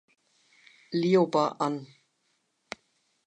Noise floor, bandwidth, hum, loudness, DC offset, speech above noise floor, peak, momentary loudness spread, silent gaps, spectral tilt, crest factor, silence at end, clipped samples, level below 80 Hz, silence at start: -74 dBFS; 9.6 kHz; none; -27 LUFS; under 0.1%; 49 dB; -10 dBFS; 21 LU; none; -6.5 dB/octave; 20 dB; 1.4 s; under 0.1%; -80 dBFS; 0.9 s